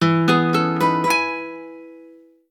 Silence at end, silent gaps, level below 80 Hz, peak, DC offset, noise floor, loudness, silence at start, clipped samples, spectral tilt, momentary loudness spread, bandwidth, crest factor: 0.45 s; none; -68 dBFS; -4 dBFS; under 0.1%; -47 dBFS; -18 LUFS; 0 s; under 0.1%; -5.5 dB/octave; 18 LU; 17 kHz; 18 dB